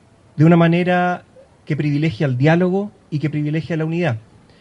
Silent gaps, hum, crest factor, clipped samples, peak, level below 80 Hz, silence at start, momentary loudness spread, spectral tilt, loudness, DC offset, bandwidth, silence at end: none; none; 16 dB; under 0.1%; -2 dBFS; -56 dBFS; 0.35 s; 13 LU; -8.5 dB/octave; -18 LUFS; under 0.1%; 7.6 kHz; 0.4 s